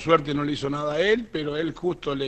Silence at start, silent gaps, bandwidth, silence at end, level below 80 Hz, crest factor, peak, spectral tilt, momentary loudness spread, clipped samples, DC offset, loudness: 0 s; none; 8.8 kHz; 0 s; -50 dBFS; 22 dB; -4 dBFS; -6 dB/octave; 7 LU; under 0.1%; under 0.1%; -25 LUFS